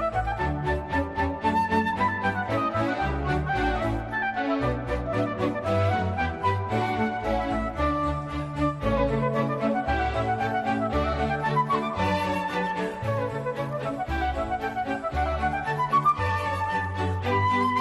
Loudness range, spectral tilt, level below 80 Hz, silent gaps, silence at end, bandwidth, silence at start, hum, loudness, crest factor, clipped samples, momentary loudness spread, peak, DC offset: 2 LU; -7 dB/octave; -38 dBFS; none; 0 s; 13 kHz; 0 s; none; -26 LUFS; 14 dB; under 0.1%; 5 LU; -12 dBFS; under 0.1%